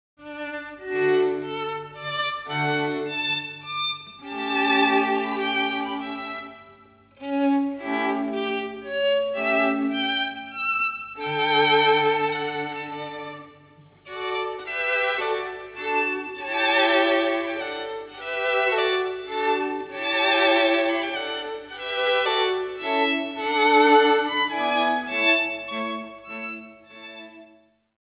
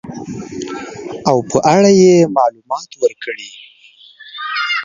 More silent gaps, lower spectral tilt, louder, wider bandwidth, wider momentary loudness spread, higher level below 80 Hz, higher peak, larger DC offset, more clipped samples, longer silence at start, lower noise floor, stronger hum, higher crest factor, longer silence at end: neither; first, -7.5 dB/octave vs -5 dB/octave; second, -23 LUFS vs -13 LUFS; second, 4 kHz vs 7.4 kHz; second, 15 LU vs 19 LU; second, -66 dBFS vs -54 dBFS; second, -6 dBFS vs 0 dBFS; neither; neither; first, 0.2 s vs 0.05 s; first, -57 dBFS vs -43 dBFS; first, 50 Hz at -65 dBFS vs none; about the same, 20 dB vs 16 dB; first, 0.55 s vs 0 s